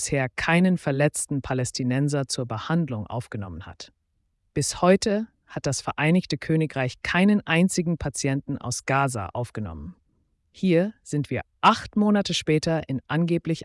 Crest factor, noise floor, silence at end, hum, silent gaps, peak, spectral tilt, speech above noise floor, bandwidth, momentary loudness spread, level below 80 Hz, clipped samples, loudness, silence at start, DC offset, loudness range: 16 dB; -72 dBFS; 0 s; none; none; -8 dBFS; -5 dB/octave; 48 dB; 12 kHz; 13 LU; -52 dBFS; under 0.1%; -24 LUFS; 0 s; under 0.1%; 4 LU